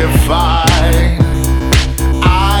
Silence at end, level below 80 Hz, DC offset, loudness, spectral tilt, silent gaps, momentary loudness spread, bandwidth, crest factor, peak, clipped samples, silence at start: 0 s; -14 dBFS; under 0.1%; -12 LUFS; -5 dB/octave; none; 3 LU; over 20 kHz; 10 dB; 0 dBFS; under 0.1%; 0 s